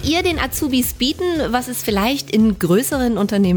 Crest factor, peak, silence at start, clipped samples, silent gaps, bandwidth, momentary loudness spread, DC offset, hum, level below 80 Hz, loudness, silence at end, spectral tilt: 14 dB; -4 dBFS; 0 s; under 0.1%; none; over 20 kHz; 4 LU; under 0.1%; none; -36 dBFS; -18 LUFS; 0 s; -4.5 dB/octave